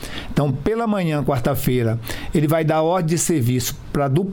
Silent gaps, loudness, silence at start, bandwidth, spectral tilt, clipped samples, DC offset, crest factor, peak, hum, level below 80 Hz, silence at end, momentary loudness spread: none; -20 LUFS; 0 s; 19 kHz; -6 dB/octave; under 0.1%; under 0.1%; 14 dB; -6 dBFS; none; -36 dBFS; 0 s; 5 LU